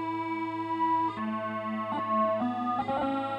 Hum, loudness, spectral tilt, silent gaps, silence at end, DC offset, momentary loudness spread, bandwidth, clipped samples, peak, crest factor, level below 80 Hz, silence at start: none; -30 LUFS; -7.5 dB/octave; none; 0 s; under 0.1%; 6 LU; 9.4 kHz; under 0.1%; -18 dBFS; 14 dB; -66 dBFS; 0 s